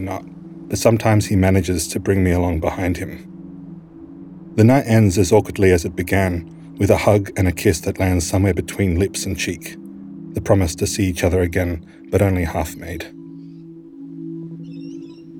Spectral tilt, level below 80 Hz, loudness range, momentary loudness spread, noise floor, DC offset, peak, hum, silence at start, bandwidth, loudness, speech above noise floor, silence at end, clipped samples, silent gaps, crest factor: -6 dB/octave; -38 dBFS; 6 LU; 22 LU; -38 dBFS; under 0.1%; -2 dBFS; none; 0 s; 17.5 kHz; -18 LUFS; 21 dB; 0 s; under 0.1%; none; 16 dB